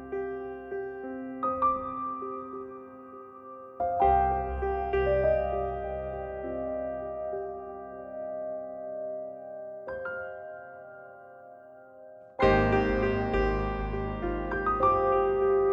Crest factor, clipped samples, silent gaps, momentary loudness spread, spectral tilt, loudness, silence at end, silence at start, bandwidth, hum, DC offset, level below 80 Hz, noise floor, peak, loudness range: 18 dB; under 0.1%; none; 21 LU; -8.5 dB/octave; -30 LUFS; 0 s; 0 s; 6.6 kHz; none; under 0.1%; -42 dBFS; -50 dBFS; -12 dBFS; 11 LU